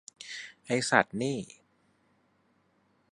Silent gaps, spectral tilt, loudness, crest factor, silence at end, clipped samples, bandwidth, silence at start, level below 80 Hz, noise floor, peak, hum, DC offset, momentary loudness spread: none; -4 dB/octave; -29 LUFS; 30 dB; 1.65 s; under 0.1%; 11.5 kHz; 0.2 s; -72 dBFS; -70 dBFS; -4 dBFS; none; under 0.1%; 17 LU